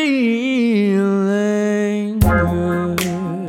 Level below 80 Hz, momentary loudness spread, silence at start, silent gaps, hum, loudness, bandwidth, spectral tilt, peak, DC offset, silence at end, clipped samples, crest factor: -32 dBFS; 5 LU; 0 s; none; none; -17 LUFS; 16.5 kHz; -6.5 dB/octave; -2 dBFS; under 0.1%; 0 s; under 0.1%; 16 dB